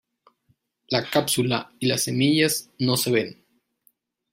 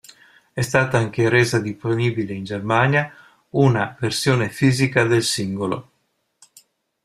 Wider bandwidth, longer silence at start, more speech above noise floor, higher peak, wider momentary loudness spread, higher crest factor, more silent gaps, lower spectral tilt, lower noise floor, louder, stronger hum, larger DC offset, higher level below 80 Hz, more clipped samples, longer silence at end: first, 16 kHz vs 14.5 kHz; first, 0.9 s vs 0.55 s; second, 46 dB vs 50 dB; about the same, -4 dBFS vs -2 dBFS; second, 6 LU vs 10 LU; about the same, 20 dB vs 18 dB; neither; second, -4 dB/octave vs -5.5 dB/octave; about the same, -68 dBFS vs -70 dBFS; second, -23 LUFS vs -20 LUFS; neither; neither; second, -64 dBFS vs -54 dBFS; neither; second, 1 s vs 1.2 s